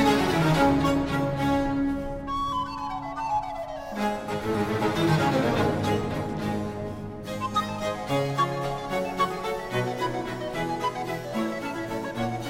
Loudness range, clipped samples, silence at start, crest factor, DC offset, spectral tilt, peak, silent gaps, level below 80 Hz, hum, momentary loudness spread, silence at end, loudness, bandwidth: 3 LU; under 0.1%; 0 s; 18 dB; under 0.1%; -6 dB/octave; -8 dBFS; none; -44 dBFS; none; 9 LU; 0 s; -27 LUFS; 16.5 kHz